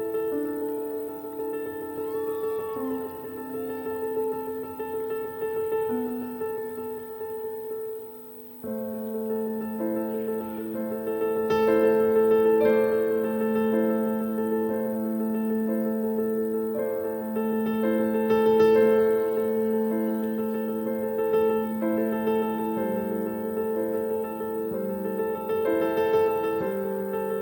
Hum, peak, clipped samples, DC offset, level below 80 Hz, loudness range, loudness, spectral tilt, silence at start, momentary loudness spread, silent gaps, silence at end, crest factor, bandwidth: none; -10 dBFS; under 0.1%; under 0.1%; -64 dBFS; 8 LU; -26 LUFS; -8 dB/octave; 0 s; 12 LU; none; 0 s; 16 dB; 17 kHz